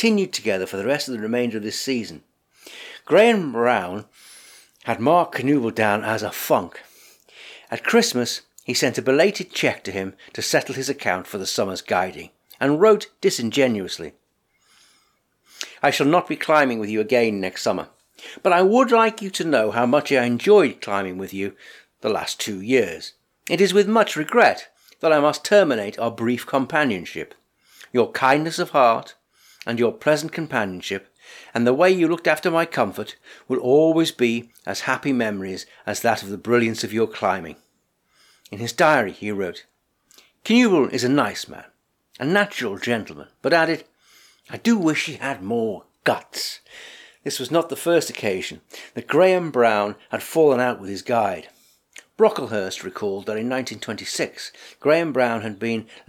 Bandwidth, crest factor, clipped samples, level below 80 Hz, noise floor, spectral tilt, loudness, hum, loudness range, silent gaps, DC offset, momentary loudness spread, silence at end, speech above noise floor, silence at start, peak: 18 kHz; 18 dB; under 0.1%; -68 dBFS; -68 dBFS; -4.5 dB/octave; -21 LUFS; none; 5 LU; none; under 0.1%; 15 LU; 0.25 s; 47 dB; 0 s; -4 dBFS